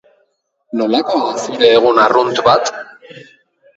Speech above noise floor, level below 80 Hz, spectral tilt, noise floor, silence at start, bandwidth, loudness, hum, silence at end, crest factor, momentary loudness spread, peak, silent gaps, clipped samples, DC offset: 50 dB; -58 dBFS; -3.5 dB/octave; -63 dBFS; 0.75 s; 8 kHz; -13 LUFS; none; 0.55 s; 14 dB; 14 LU; 0 dBFS; none; under 0.1%; under 0.1%